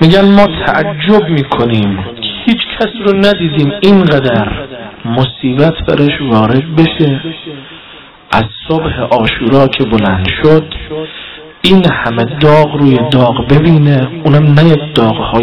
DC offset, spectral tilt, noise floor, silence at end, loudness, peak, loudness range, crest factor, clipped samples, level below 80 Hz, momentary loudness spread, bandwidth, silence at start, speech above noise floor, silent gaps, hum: 0.8%; -8 dB/octave; -34 dBFS; 0 s; -9 LUFS; 0 dBFS; 4 LU; 10 dB; under 0.1%; -32 dBFS; 14 LU; 9.8 kHz; 0 s; 25 dB; none; none